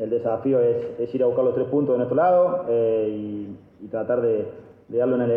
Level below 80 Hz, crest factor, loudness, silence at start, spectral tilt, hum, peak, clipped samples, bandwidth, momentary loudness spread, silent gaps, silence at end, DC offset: -64 dBFS; 12 dB; -22 LUFS; 0 s; -11 dB/octave; none; -10 dBFS; under 0.1%; 3.5 kHz; 13 LU; none; 0 s; under 0.1%